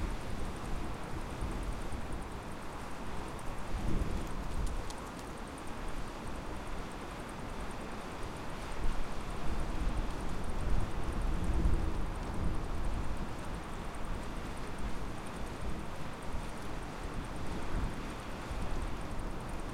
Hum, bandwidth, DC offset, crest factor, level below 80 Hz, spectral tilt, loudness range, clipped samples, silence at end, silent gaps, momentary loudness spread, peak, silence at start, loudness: none; 13.5 kHz; under 0.1%; 18 dB; -40 dBFS; -5.5 dB/octave; 5 LU; under 0.1%; 0 s; none; 6 LU; -18 dBFS; 0 s; -41 LUFS